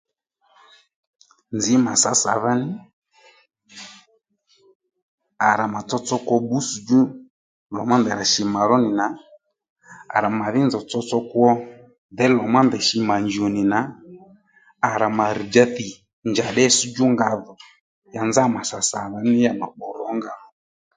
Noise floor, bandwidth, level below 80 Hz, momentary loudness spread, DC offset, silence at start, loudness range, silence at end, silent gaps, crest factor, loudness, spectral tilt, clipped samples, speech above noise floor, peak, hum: -64 dBFS; 9.6 kHz; -62 dBFS; 15 LU; under 0.1%; 1.5 s; 5 LU; 0.6 s; 2.93-3.02 s, 4.75-4.80 s, 5.02-5.18 s, 7.30-7.66 s, 9.70-9.76 s, 11.98-12.09 s, 16.13-16.22 s, 17.81-18.02 s; 22 dB; -20 LUFS; -4 dB/octave; under 0.1%; 45 dB; 0 dBFS; none